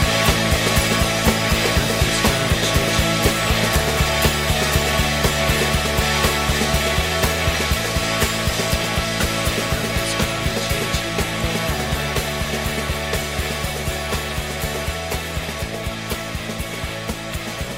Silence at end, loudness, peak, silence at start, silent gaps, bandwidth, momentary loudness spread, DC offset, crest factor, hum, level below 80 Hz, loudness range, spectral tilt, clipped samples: 0 s; -20 LUFS; -2 dBFS; 0 s; none; 16.5 kHz; 9 LU; 0.3%; 18 dB; none; -28 dBFS; 7 LU; -3.5 dB/octave; under 0.1%